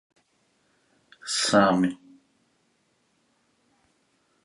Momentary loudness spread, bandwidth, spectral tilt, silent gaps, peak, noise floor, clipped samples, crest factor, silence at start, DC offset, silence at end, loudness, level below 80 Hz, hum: 21 LU; 11.5 kHz; -4 dB/octave; none; -6 dBFS; -69 dBFS; under 0.1%; 24 dB; 1.25 s; under 0.1%; 2.5 s; -23 LUFS; -68 dBFS; none